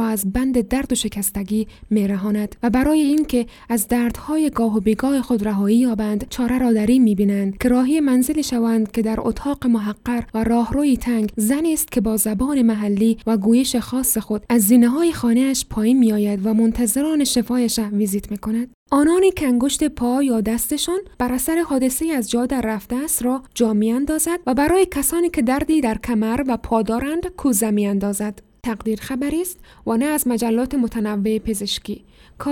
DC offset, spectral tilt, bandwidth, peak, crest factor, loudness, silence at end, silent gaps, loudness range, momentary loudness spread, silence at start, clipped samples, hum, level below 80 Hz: under 0.1%; -4.5 dB/octave; 18.5 kHz; -4 dBFS; 16 dB; -19 LUFS; 0 s; 18.74-18.86 s; 4 LU; 7 LU; 0 s; under 0.1%; none; -40 dBFS